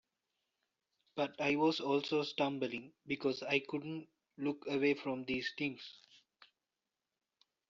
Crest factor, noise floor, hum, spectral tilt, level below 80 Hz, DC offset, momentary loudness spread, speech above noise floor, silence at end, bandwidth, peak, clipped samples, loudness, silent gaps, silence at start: 20 dB; under -90 dBFS; none; -3 dB/octave; -78 dBFS; under 0.1%; 13 LU; over 53 dB; 1.25 s; 7.4 kHz; -18 dBFS; under 0.1%; -37 LUFS; none; 1.15 s